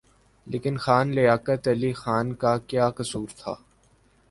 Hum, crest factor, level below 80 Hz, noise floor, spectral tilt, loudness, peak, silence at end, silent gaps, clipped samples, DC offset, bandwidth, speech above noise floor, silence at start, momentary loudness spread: none; 20 dB; -56 dBFS; -61 dBFS; -6.5 dB/octave; -25 LUFS; -6 dBFS; 0.75 s; none; under 0.1%; under 0.1%; 11.5 kHz; 37 dB; 0.45 s; 13 LU